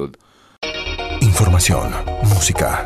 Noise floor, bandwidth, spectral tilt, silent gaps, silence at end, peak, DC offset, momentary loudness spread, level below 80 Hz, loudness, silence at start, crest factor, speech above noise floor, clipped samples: -46 dBFS; 14 kHz; -4 dB/octave; none; 0 s; -4 dBFS; under 0.1%; 12 LU; -28 dBFS; -17 LUFS; 0 s; 12 dB; 31 dB; under 0.1%